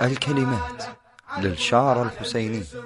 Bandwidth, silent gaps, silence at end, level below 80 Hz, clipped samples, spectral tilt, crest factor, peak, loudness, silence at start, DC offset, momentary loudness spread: 11.5 kHz; none; 0 s; -48 dBFS; under 0.1%; -5.5 dB/octave; 18 dB; -6 dBFS; -23 LUFS; 0 s; under 0.1%; 14 LU